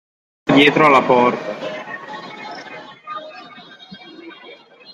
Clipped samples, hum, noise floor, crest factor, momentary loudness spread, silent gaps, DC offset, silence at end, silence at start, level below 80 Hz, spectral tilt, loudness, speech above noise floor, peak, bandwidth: under 0.1%; none; -42 dBFS; 18 dB; 26 LU; none; under 0.1%; 0.4 s; 0.45 s; -60 dBFS; -5.5 dB/octave; -14 LUFS; 28 dB; 0 dBFS; 11.5 kHz